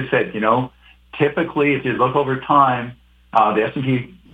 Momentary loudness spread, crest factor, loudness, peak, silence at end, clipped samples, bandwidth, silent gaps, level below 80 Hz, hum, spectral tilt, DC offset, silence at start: 9 LU; 18 dB; -18 LUFS; 0 dBFS; 0.25 s; under 0.1%; 8 kHz; none; -52 dBFS; none; -8.5 dB/octave; under 0.1%; 0 s